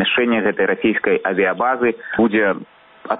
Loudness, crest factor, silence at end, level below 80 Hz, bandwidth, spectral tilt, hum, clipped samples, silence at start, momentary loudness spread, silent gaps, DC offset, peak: -18 LUFS; 14 dB; 0 s; -56 dBFS; 4 kHz; -2.5 dB/octave; none; under 0.1%; 0 s; 4 LU; none; under 0.1%; -4 dBFS